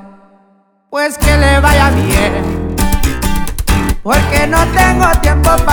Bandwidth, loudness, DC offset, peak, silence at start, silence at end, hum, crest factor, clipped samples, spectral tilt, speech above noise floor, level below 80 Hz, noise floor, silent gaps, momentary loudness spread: over 20 kHz; -12 LUFS; under 0.1%; 0 dBFS; 0 s; 0 s; none; 10 dB; under 0.1%; -5 dB/octave; 43 dB; -16 dBFS; -52 dBFS; none; 8 LU